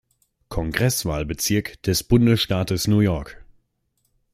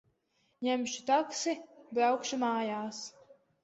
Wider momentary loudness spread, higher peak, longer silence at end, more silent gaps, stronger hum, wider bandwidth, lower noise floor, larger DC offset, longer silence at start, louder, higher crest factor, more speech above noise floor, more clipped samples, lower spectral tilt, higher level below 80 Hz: about the same, 12 LU vs 11 LU; first, -2 dBFS vs -16 dBFS; first, 0.9 s vs 0.3 s; neither; neither; first, 16 kHz vs 8.2 kHz; second, -71 dBFS vs -75 dBFS; neither; about the same, 0.5 s vs 0.6 s; first, -21 LUFS vs -33 LUFS; about the same, 20 dB vs 18 dB; first, 50 dB vs 43 dB; neither; first, -5 dB/octave vs -2.5 dB/octave; first, -40 dBFS vs -80 dBFS